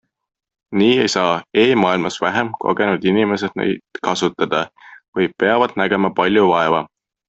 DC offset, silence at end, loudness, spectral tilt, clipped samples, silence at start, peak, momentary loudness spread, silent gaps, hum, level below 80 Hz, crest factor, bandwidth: under 0.1%; 0.45 s; -17 LUFS; -5 dB/octave; under 0.1%; 0.7 s; -2 dBFS; 8 LU; 5.08-5.13 s; none; -58 dBFS; 16 dB; 8.2 kHz